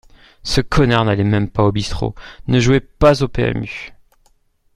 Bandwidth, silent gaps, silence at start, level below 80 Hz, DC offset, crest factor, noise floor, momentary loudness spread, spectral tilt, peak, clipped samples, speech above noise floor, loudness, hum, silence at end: 12 kHz; none; 0.45 s; -32 dBFS; under 0.1%; 16 dB; -57 dBFS; 15 LU; -6 dB/octave; 0 dBFS; under 0.1%; 41 dB; -16 LUFS; none; 0.85 s